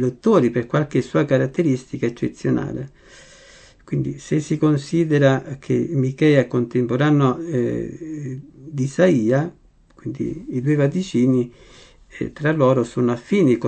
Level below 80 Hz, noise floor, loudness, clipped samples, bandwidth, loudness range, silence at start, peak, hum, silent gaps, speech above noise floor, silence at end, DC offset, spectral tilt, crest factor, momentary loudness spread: -52 dBFS; -47 dBFS; -20 LUFS; under 0.1%; 8.8 kHz; 5 LU; 0 s; -2 dBFS; none; none; 28 dB; 0 s; under 0.1%; -7.5 dB/octave; 18 dB; 14 LU